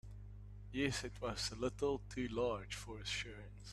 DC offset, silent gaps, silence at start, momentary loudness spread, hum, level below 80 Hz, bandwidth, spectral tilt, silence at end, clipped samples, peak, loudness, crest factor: under 0.1%; none; 0.05 s; 15 LU; 50 Hz at -50 dBFS; -56 dBFS; 13 kHz; -4 dB/octave; 0 s; under 0.1%; -20 dBFS; -41 LUFS; 22 dB